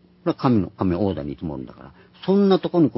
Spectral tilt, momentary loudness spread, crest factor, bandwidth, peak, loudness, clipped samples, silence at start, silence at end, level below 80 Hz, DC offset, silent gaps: -12 dB/octave; 14 LU; 18 dB; 5.8 kHz; -4 dBFS; -22 LUFS; under 0.1%; 0.25 s; 0.05 s; -46 dBFS; under 0.1%; none